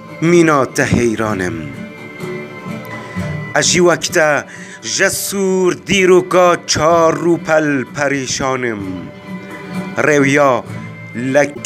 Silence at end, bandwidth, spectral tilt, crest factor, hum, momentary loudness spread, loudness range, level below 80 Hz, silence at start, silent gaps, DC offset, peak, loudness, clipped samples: 0 s; 15.5 kHz; -4 dB/octave; 14 dB; none; 17 LU; 4 LU; -46 dBFS; 0 s; none; under 0.1%; 0 dBFS; -14 LUFS; under 0.1%